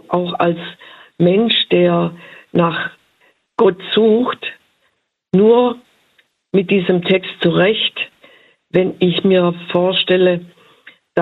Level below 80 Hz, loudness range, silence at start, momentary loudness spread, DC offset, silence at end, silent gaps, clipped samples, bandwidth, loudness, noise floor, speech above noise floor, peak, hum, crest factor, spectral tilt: -58 dBFS; 2 LU; 0.1 s; 12 LU; under 0.1%; 0 s; none; under 0.1%; 4.5 kHz; -15 LUFS; -65 dBFS; 51 dB; 0 dBFS; none; 16 dB; -8.5 dB/octave